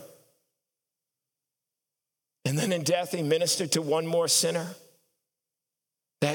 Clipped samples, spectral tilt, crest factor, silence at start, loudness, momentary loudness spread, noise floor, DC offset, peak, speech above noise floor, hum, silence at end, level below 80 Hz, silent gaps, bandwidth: under 0.1%; -3.5 dB/octave; 20 dB; 0 s; -26 LUFS; 9 LU; -88 dBFS; under 0.1%; -10 dBFS; 62 dB; none; 0 s; -86 dBFS; none; 19 kHz